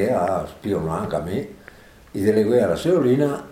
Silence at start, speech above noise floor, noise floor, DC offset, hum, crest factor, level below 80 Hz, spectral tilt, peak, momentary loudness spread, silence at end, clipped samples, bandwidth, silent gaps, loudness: 0 s; 26 dB; -46 dBFS; under 0.1%; none; 16 dB; -48 dBFS; -7 dB/octave; -6 dBFS; 11 LU; 0 s; under 0.1%; 16 kHz; none; -21 LUFS